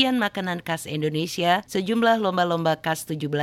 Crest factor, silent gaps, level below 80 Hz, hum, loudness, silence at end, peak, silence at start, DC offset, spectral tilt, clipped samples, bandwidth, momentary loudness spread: 18 dB; none; -62 dBFS; none; -24 LUFS; 0 s; -4 dBFS; 0 s; under 0.1%; -5 dB/octave; under 0.1%; 16.5 kHz; 7 LU